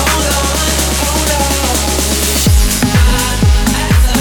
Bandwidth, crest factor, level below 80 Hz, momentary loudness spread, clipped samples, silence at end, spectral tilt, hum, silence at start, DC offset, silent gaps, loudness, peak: 19.5 kHz; 10 dB; -14 dBFS; 2 LU; under 0.1%; 0 s; -3.5 dB/octave; none; 0 s; under 0.1%; none; -12 LUFS; 0 dBFS